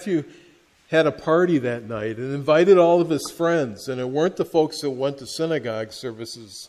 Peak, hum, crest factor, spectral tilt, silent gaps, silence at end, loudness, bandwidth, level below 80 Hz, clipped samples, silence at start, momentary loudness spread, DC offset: -4 dBFS; none; 18 dB; -6 dB/octave; none; 0.05 s; -21 LUFS; 14 kHz; -62 dBFS; under 0.1%; 0 s; 15 LU; under 0.1%